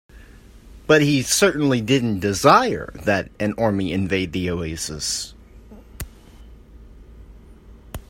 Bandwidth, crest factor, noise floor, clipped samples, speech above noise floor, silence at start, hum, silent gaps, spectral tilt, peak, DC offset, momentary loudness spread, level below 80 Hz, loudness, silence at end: 16.5 kHz; 22 dB; -45 dBFS; under 0.1%; 25 dB; 0.15 s; none; none; -4.5 dB/octave; 0 dBFS; under 0.1%; 21 LU; -44 dBFS; -20 LUFS; 0.1 s